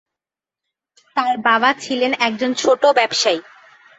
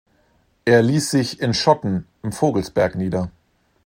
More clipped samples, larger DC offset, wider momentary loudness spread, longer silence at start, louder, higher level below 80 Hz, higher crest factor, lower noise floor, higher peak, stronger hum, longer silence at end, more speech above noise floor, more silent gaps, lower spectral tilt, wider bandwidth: neither; neither; second, 7 LU vs 10 LU; first, 1.15 s vs 0.65 s; first, -17 LUFS vs -20 LUFS; second, -68 dBFS vs -52 dBFS; about the same, 18 dB vs 20 dB; first, -88 dBFS vs -61 dBFS; about the same, -2 dBFS vs 0 dBFS; neither; about the same, 0.55 s vs 0.55 s; first, 71 dB vs 42 dB; neither; second, -2 dB/octave vs -5.5 dB/octave; second, 8 kHz vs 16 kHz